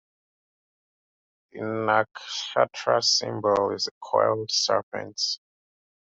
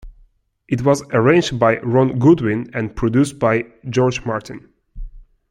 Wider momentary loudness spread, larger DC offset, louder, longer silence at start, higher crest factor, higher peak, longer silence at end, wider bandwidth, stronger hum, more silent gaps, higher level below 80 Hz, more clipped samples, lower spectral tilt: about the same, 10 LU vs 11 LU; neither; second, -25 LUFS vs -17 LUFS; first, 1.55 s vs 0.05 s; first, 22 dB vs 16 dB; second, -6 dBFS vs -2 dBFS; first, 0.75 s vs 0.3 s; second, 8 kHz vs 12 kHz; neither; first, 3.91-4.01 s, 4.83-4.92 s vs none; second, -70 dBFS vs -40 dBFS; neither; second, -2.5 dB/octave vs -6.5 dB/octave